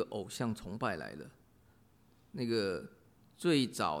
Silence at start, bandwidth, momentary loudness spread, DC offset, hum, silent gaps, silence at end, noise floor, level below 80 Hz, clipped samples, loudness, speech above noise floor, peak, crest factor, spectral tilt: 0 s; 16 kHz; 19 LU; under 0.1%; none; none; 0 s; -66 dBFS; -66 dBFS; under 0.1%; -36 LUFS; 31 dB; -18 dBFS; 20 dB; -5 dB/octave